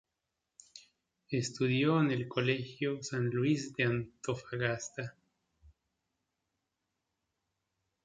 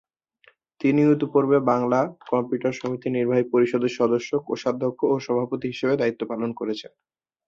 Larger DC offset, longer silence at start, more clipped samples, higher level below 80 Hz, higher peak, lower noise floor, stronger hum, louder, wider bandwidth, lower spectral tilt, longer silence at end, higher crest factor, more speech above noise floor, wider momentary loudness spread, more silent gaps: neither; about the same, 0.75 s vs 0.8 s; neither; about the same, -70 dBFS vs -66 dBFS; second, -16 dBFS vs -6 dBFS; first, -87 dBFS vs -60 dBFS; neither; second, -33 LUFS vs -23 LUFS; first, 9.4 kHz vs 7.6 kHz; second, -5.5 dB/octave vs -7 dB/octave; first, 2.95 s vs 0.6 s; about the same, 20 dB vs 16 dB; first, 54 dB vs 37 dB; first, 12 LU vs 8 LU; neither